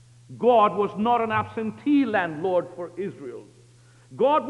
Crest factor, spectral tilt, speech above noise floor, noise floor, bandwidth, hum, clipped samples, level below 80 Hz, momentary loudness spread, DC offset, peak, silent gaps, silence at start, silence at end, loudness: 16 dB; -7 dB/octave; 30 dB; -53 dBFS; 10.5 kHz; none; under 0.1%; -66 dBFS; 16 LU; under 0.1%; -8 dBFS; none; 0.3 s; 0 s; -23 LUFS